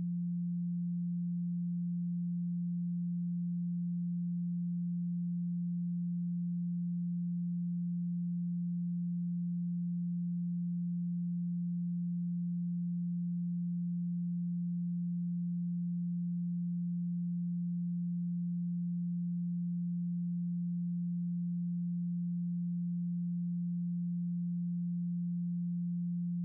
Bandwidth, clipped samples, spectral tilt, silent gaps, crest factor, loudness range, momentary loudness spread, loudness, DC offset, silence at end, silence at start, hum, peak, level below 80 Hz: 0.2 kHz; under 0.1%; -28 dB/octave; none; 4 dB; 0 LU; 0 LU; -36 LUFS; under 0.1%; 0 s; 0 s; none; -32 dBFS; under -90 dBFS